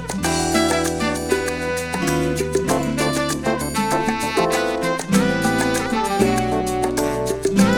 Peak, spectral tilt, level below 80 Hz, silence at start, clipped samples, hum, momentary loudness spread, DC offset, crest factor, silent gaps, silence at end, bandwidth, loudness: -4 dBFS; -4.5 dB/octave; -38 dBFS; 0 s; under 0.1%; none; 4 LU; under 0.1%; 16 dB; none; 0 s; 19 kHz; -20 LUFS